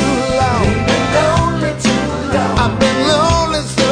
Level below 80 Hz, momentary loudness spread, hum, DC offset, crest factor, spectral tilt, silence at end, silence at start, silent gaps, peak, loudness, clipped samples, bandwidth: -28 dBFS; 4 LU; none; under 0.1%; 14 dB; -5 dB/octave; 0 s; 0 s; none; 0 dBFS; -14 LUFS; under 0.1%; 10 kHz